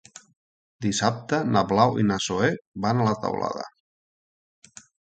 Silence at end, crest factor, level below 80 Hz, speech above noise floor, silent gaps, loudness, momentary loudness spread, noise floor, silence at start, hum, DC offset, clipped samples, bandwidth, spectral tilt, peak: 1.5 s; 22 dB; -56 dBFS; over 67 dB; 2.67-2.72 s; -24 LUFS; 10 LU; under -90 dBFS; 0.8 s; none; under 0.1%; under 0.1%; 9.4 kHz; -5 dB/octave; -4 dBFS